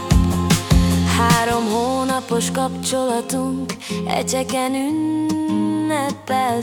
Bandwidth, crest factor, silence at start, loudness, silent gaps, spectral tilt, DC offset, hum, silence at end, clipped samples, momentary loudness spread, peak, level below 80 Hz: 18 kHz; 16 dB; 0 s; -19 LUFS; none; -5 dB/octave; under 0.1%; none; 0 s; under 0.1%; 6 LU; -2 dBFS; -30 dBFS